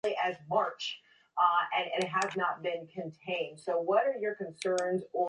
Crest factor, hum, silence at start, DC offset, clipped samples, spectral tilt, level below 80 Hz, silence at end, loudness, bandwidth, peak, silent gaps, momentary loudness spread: 18 dB; none; 0.05 s; under 0.1%; under 0.1%; -4 dB/octave; -80 dBFS; 0 s; -32 LUFS; 11 kHz; -14 dBFS; none; 11 LU